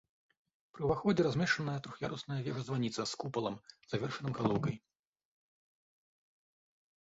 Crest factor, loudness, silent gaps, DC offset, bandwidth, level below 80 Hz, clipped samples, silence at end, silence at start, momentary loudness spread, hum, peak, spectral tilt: 22 dB; -36 LUFS; none; under 0.1%; 7.6 kHz; -64 dBFS; under 0.1%; 2.2 s; 0.75 s; 10 LU; none; -16 dBFS; -5 dB/octave